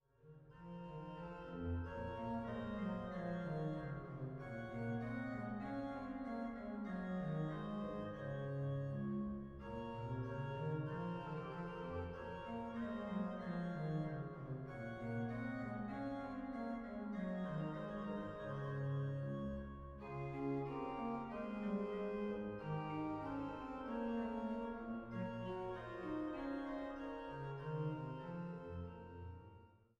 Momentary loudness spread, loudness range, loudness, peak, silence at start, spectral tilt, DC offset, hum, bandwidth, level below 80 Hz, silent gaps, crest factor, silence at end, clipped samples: 6 LU; 2 LU; -45 LUFS; -30 dBFS; 0.25 s; -9 dB/octave; under 0.1%; none; 7.4 kHz; -62 dBFS; none; 14 dB; 0.2 s; under 0.1%